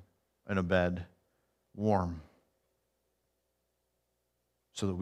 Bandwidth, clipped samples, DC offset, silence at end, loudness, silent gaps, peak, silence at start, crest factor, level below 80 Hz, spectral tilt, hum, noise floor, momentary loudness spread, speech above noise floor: 11 kHz; under 0.1%; under 0.1%; 0 s; -33 LUFS; none; -14 dBFS; 0.45 s; 22 dB; -60 dBFS; -6.5 dB/octave; 60 Hz at -60 dBFS; -81 dBFS; 18 LU; 49 dB